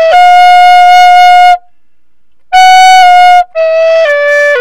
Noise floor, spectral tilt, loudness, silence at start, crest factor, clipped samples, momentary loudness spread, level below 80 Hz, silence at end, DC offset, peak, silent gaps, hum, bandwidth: -63 dBFS; 1 dB/octave; -3 LUFS; 0 s; 4 dB; 10%; 6 LU; -44 dBFS; 0 s; under 0.1%; 0 dBFS; none; none; 15 kHz